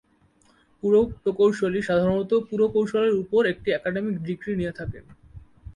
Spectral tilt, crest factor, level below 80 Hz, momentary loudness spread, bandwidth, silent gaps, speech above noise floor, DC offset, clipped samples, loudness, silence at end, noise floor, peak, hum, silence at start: -7 dB/octave; 14 dB; -50 dBFS; 9 LU; 10.5 kHz; none; 38 dB; under 0.1%; under 0.1%; -23 LUFS; 0.05 s; -61 dBFS; -10 dBFS; none; 0.85 s